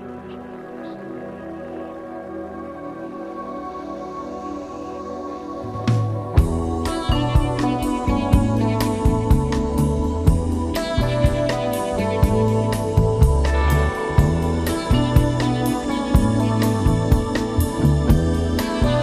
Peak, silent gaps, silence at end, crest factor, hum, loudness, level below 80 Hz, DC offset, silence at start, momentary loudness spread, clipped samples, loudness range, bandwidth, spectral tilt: -2 dBFS; none; 0 s; 18 dB; none; -20 LUFS; -26 dBFS; under 0.1%; 0 s; 14 LU; under 0.1%; 12 LU; 15.5 kHz; -7 dB/octave